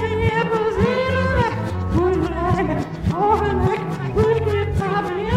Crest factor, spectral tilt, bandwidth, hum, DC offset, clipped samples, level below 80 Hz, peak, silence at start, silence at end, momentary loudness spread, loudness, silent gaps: 14 dB; -7.5 dB/octave; 13 kHz; none; under 0.1%; under 0.1%; -32 dBFS; -6 dBFS; 0 s; 0 s; 5 LU; -20 LUFS; none